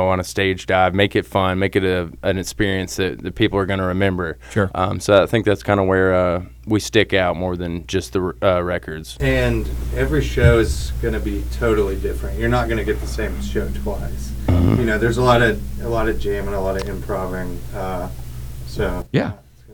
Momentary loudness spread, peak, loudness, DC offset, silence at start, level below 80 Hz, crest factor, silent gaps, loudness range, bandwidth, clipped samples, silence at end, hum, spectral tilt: 11 LU; 0 dBFS; -20 LUFS; under 0.1%; 0 s; -28 dBFS; 18 dB; none; 4 LU; over 20 kHz; under 0.1%; 0 s; none; -6 dB/octave